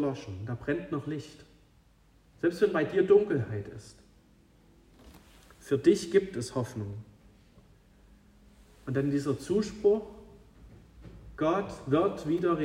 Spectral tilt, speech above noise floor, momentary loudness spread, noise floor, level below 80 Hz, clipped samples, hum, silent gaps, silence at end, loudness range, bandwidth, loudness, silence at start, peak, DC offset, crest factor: -7 dB/octave; 33 dB; 19 LU; -62 dBFS; -58 dBFS; under 0.1%; none; none; 0 s; 4 LU; 12 kHz; -29 LUFS; 0 s; -10 dBFS; under 0.1%; 20 dB